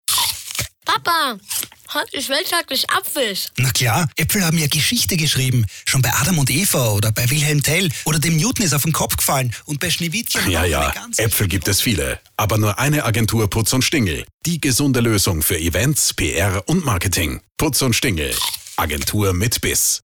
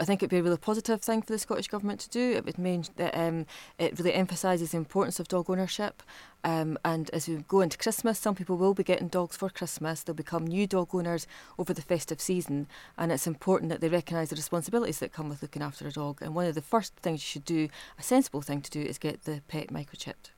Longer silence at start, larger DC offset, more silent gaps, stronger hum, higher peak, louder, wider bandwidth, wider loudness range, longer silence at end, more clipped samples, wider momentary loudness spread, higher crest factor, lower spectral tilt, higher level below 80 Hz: about the same, 0.1 s vs 0 s; neither; first, 14.34-14.39 s vs none; neither; first, -6 dBFS vs -12 dBFS; first, -18 LUFS vs -31 LUFS; first, over 20 kHz vs 17 kHz; about the same, 2 LU vs 3 LU; about the same, 0.1 s vs 0.1 s; neither; second, 6 LU vs 10 LU; second, 12 dB vs 18 dB; second, -3.5 dB/octave vs -5 dB/octave; first, -38 dBFS vs -62 dBFS